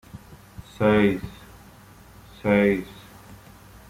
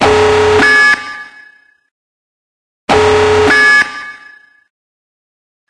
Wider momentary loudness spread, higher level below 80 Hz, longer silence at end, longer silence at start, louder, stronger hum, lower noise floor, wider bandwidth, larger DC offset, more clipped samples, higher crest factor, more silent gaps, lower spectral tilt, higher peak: first, 26 LU vs 20 LU; second, -50 dBFS vs -40 dBFS; second, 0.55 s vs 1.55 s; first, 0.15 s vs 0 s; second, -22 LUFS vs -8 LUFS; neither; first, -48 dBFS vs -44 dBFS; first, 15.5 kHz vs 11 kHz; neither; neither; first, 20 dB vs 12 dB; second, none vs 1.91-2.87 s; first, -7.5 dB/octave vs -3.5 dB/octave; second, -6 dBFS vs 0 dBFS